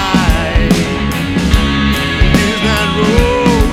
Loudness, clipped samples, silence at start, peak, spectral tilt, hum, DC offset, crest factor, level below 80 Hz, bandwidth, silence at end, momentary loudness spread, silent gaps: -12 LUFS; under 0.1%; 0 s; 0 dBFS; -5.5 dB/octave; none; under 0.1%; 12 dB; -18 dBFS; 16.5 kHz; 0 s; 3 LU; none